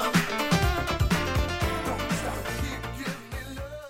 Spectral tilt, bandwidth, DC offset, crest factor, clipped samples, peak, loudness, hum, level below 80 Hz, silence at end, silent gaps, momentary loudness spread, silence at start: -5 dB/octave; 16.5 kHz; under 0.1%; 18 dB; under 0.1%; -10 dBFS; -28 LUFS; none; -36 dBFS; 0 s; none; 11 LU; 0 s